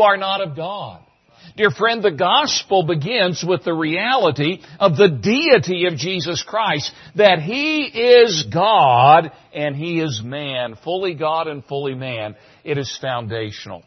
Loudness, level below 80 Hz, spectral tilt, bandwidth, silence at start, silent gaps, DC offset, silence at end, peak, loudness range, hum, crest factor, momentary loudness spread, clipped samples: -17 LUFS; -60 dBFS; -4.5 dB/octave; 6.4 kHz; 0 s; none; under 0.1%; 0.1 s; 0 dBFS; 9 LU; none; 18 dB; 13 LU; under 0.1%